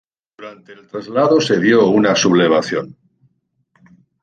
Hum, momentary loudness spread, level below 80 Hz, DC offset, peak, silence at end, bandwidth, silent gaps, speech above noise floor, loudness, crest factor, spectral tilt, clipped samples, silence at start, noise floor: none; 24 LU; -60 dBFS; under 0.1%; -2 dBFS; 1.35 s; 9.2 kHz; none; 48 dB; -14 LUFS; 14 dB; -4.5 dB/octave; under 0.1%; 0.4 s; -63 dBFS